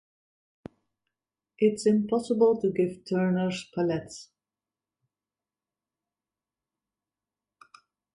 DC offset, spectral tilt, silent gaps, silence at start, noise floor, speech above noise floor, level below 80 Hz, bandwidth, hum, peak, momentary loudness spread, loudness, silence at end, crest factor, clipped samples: under 0.1%; -6.5 dB/octave; none; 1.6 s; under -90 dBFS; over 64 dB; -70 dBFS; 11.5 kHz; none; -12 dBFS; 8 LU; -26 LUFS; 3.9 s; 20 dB; under 0.1%